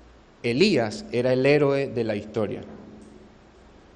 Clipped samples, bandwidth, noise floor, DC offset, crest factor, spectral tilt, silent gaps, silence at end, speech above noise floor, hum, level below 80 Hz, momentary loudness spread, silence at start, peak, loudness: under 0.1%; 10 kHz; -51 dBFS; under 0.1%; 20 dB; -6 dB/octave; none; 0.85 s; 28 dB; none; -56 dBFS; 14 LU; 0.45 s; -6 dBFS; -23 LUFS